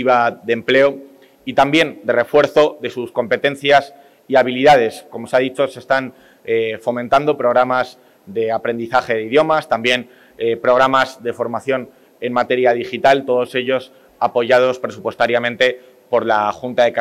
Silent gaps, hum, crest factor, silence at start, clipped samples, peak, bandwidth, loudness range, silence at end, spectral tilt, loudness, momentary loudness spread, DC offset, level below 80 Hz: none; none; 14 dB; 0 s; under 0.1%; -2 dBFS; 13.5 kHz; 3 LU; 0 s; -5 dB/octave; -17 LUFS; 9 LU; under 0.1%; -58 dBFS